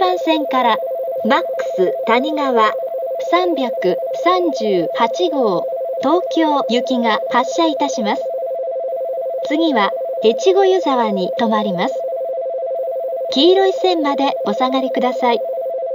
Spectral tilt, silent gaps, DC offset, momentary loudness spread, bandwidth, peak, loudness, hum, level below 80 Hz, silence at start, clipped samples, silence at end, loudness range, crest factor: -4.5 dB/octave; none; under 0.1%; 8 LU; 16 kHz; -2 dBFS; -17 LUFS; none; -76 dBFS; 0 s; under 0.1%; 0 s; 1 LU; 16 dB